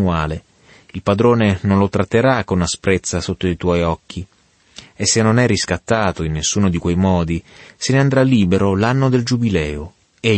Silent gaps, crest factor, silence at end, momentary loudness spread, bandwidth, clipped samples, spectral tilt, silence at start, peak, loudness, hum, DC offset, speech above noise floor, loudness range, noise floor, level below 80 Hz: none; 16 dB; 0 s; 11 LU; 8.8 kHz; under 0.1%; -5.5 dB/octave; 0 s; -2 dBFS; -17 LUFS; none; under 0.1%; 27 dB; 2 LU; -44 dBFS; -38 dBFS